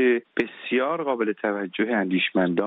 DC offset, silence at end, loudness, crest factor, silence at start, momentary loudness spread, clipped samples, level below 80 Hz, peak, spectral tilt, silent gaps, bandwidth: under 0.1%; 0 s; -24 LUFS; 16 dB; 0 s; 5 LU; under 0.1%; -68 dBFS; -8 dBFS; -3.5 dB/octave; none; 5.6 kHz